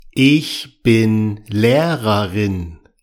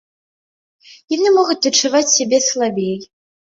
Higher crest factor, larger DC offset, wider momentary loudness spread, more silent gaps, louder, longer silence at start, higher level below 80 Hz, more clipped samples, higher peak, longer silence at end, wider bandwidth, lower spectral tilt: about the same, 14 dB vs 16 dB; neither; about the same, 9 LU vs 10 LU; neither; about the same, -16 LUFS vs -15 LUFS; second, 0.15 s vs 1.1 s; first, -44 dBFS vs -66 dBFS; neither; about the same, -2 dBFS vs -2 dBFS; second, 0.25 s vs 0.4 s; first, 17.5 kHz vs 7.8 kHz; first, -6.5 dB/octave vs -2 dB/octave